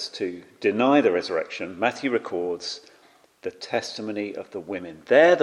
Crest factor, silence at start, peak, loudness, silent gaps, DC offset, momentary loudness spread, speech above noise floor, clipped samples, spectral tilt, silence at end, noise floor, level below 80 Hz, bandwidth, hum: 22 dB; 0 s; -2 dBFS; -25 LUFS; none; under 0.1%; 16 LU; 33 dB; under 0.1%; -4.5 dB/octave; 0 s; -57 dBFS; -72 dBFS; 11 kHz; none